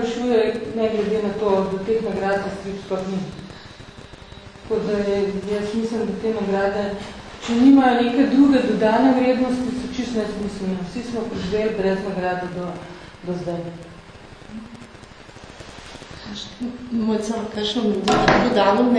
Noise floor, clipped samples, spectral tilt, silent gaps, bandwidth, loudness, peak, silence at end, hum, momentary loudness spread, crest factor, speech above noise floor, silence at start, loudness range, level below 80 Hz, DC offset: -42 dBFS; under 0.1%; -6 dB/octave; none; 10.5 kHz; -21 LUFS; 0 dBFS; 0 s; none; 23 LU; 22 dB; 22 dB; 0 s; 15 LU; -46 dBFS; under 0.1%